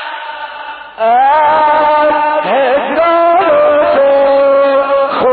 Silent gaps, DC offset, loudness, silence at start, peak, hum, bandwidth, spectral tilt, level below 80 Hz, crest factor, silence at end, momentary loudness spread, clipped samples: none; under 0.1%; -9 LUFS; 0 s; -2 dBFS; none; 4.7 kHz; -1 dB/octave; -50 dBFS; 8 dB; 0 s; 14 LU; under 0.1%